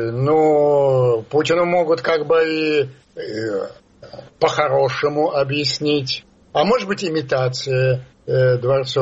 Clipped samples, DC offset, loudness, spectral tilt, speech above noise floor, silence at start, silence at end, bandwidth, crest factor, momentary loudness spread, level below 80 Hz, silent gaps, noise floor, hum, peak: under 0.1%; under 0.1%; -18 LUFS; -6 dB/octave; 22 dB; 0 s; 0 s; 8 kHz; 16 dB; 10 LU; -54 dBFS; none; -40 dBFS; none; -2 dBFS